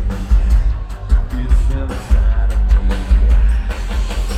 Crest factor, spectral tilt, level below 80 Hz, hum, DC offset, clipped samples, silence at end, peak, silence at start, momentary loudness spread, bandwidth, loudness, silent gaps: 12 dB; -6.5 dB/octave; -14 dBFS; none; under 0.1%; under 0.1%; 0 s; -2 dBFS; 0 s; 7 LU; 8.8 kHz; -18 LUFS; none